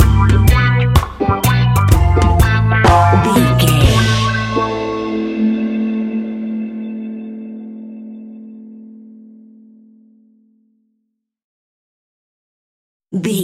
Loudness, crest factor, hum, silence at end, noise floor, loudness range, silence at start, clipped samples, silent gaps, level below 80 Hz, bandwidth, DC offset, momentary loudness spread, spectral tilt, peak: -14 LUFS; 16 dB; none; 0 s; -71 dBFS; 20 LU; 0 s; under 0.1%; 11.44-13.00 s; -24 dBFS; 16 kHz; under 0.1%; 20 LU; -6 dB/octave; 0 dBFS